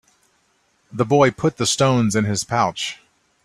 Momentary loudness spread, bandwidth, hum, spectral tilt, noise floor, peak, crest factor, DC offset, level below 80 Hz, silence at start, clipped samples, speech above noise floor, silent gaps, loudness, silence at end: 12 LU; 15 kHz; none; -4.5 dB/octave; -63 dBFS; -2 dBFS; 18 dB; under 0.1%; -54 dBFS; 0.95 s; under 0.1%; 45 dB; none; -19 LUFS; 0.5 s